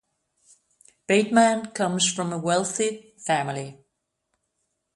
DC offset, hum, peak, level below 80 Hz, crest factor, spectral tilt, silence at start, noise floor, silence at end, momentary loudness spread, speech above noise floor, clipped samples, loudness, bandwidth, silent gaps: under 0.1%; none; -4 dBFS; -70 dBFS; 22 dB; -3.5 dB/octave; 1.1 s; -77 dBFS; 1.2 s; 15 LU; 54 dB; under 0.1%; -23 LUFS; 11.5 kHz; none